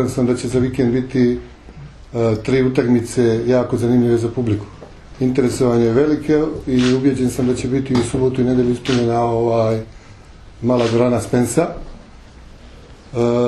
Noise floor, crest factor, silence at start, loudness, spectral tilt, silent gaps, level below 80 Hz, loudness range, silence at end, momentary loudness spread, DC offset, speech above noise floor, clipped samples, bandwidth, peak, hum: -40 dBFS; 16 dB; 0 s; -17 LUFS; -7 dB/octave; none; -40 dBFS; 3 LU; 0 s; 7 LU; under 0.1%; 24 dB; under 0.1%; 12.5 kHz; -2 dBFS; none